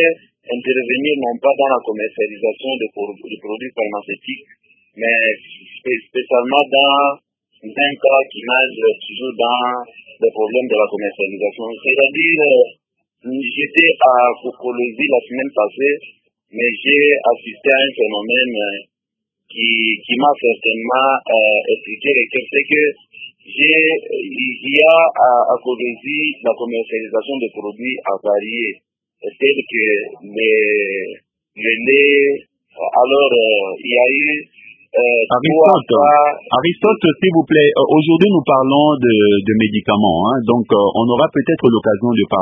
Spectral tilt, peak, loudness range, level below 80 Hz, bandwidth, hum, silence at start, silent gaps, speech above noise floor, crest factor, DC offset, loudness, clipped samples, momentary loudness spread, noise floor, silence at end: -8 dB/octave; 0 dBFS; 7 LU; -56 dBFS; 3.8 kHz; none; 0 s; none; 66 dB; 16 dB; under 0.1%; -14 LUFS; under 0.1%; 13 LU; -81 dBFS; 0 s